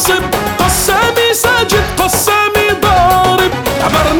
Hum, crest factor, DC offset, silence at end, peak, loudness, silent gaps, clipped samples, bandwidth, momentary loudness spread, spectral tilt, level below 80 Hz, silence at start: none; 10 dB; under 0.1%; 0 s; 0 dBFS; -10 LUFS; none; under 0.1%; over 20 kHz; 4 LU; -3 dB/octave; -26 dBFS; 0 s